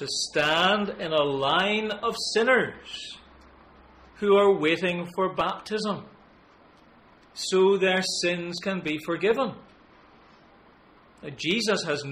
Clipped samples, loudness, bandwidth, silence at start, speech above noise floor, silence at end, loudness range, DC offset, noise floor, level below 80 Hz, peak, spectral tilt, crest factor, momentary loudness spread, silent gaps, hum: under 0.1%; -25 LUFS; 14 kHz; 0 s; 30 dB; 0 s; 5 LU; under 0.1%; -55 dBFS; -62 dBFS; -10 dBFS; -3.5 dB/octave; 18 dB; 14 LU; none; none